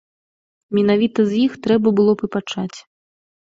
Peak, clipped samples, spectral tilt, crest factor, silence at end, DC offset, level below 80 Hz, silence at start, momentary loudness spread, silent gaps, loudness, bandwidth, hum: -4 dBFS; under 0.1%; -7 dB/octave; 16 dB; 0.8 s; under 0.1%; -60 dBFS; 0.7 s; 10 LU; none; -18 LUFS; 7.8 kHz; none